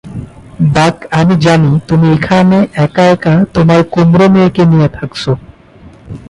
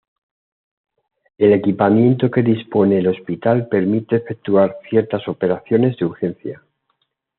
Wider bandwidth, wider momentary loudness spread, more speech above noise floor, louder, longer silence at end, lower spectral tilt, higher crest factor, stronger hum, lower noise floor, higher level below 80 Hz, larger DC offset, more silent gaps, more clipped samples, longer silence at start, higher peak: first, 11 kHz vs 4.3 kHz; about the same, 9 LU vs 8 LU; second, 29 dB vs 53 dB; first, -9 LUFS vs -17 LUFS; second, 0.15 s vs 0.85 s; about the same, -7.5 dB/octave vs -7.5 dB/octave; second, 10 dB vs 16 dB; neither; second, -37 dBFS vs -69 dBFS; first, -36 dBFS vs -64 dBFS; neither; neither; neither; second, 0.05 s vs 1.4 s; about the same, 0 dBFS vs -2 dBFS